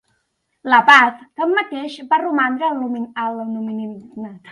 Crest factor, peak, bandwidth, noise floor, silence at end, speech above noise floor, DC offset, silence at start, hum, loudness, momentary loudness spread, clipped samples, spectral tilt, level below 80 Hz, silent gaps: 18 dB; 0 dBFS; 11.5 kHz; -70 dBFS; 0 s; 52 dB; under 0.1%; 0.65 s; none; -16 LUFS; 21 LU; under 0.1%; -4 dB/octave; -68 dBFS; none